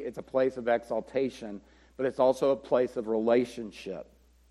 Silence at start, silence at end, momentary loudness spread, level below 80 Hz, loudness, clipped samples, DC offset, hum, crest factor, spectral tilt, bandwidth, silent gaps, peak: 0 s; 0.45 s; 15 LU; -62 dBFS; -29 LUFS; under 0.1%; under 0.1%; none; 18 dB; -6 dB/octave; 12.5 kHz; none; -12 dBFS